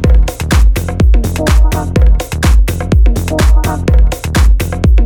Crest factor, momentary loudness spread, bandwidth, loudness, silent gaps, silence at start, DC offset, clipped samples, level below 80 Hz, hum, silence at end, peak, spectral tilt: 8 dB; 2 LU; 17.5 kHz; -12 LUFS; none; 0 s; under 0.1%; under 0.1%; -10 dBFS; none; 0 s; 0 dBFS; -6 dB/octave